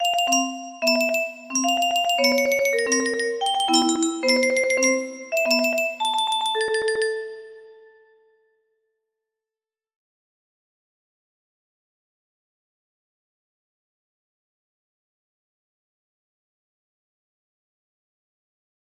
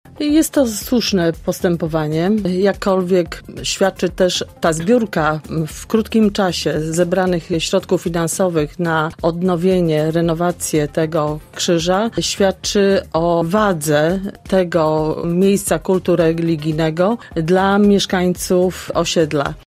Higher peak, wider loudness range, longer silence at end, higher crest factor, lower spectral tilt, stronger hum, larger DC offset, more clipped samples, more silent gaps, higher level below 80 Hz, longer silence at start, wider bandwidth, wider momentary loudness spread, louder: second, -6 dBFS vs -2 dBFS; first, 8 LU vs 2 LU; first, 11.25 s vs 0.1 s; first, 20 dB vs 14 dB; second, 0 dB/octave vs -5 dB/octave; neither; neither; neither; neither; second, -72 dBFS vs -40 dBFS; second, 0 s vs 0.15 s; about the same, 15.5 kHz vs 16 kHz; about the same, 6 LU vs 4 LU; second, -21 LUFS vs -17 LUFS